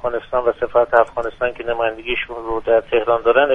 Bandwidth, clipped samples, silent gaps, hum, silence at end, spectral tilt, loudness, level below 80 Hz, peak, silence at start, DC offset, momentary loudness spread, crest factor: 4 kHz; under 0.1%; none; none; 0 s; -6 dB/octave; -19 LUFS; -42 dBFS; 0 dBFS; 0.05 s; under 0.1%; 8 LU; 18 dB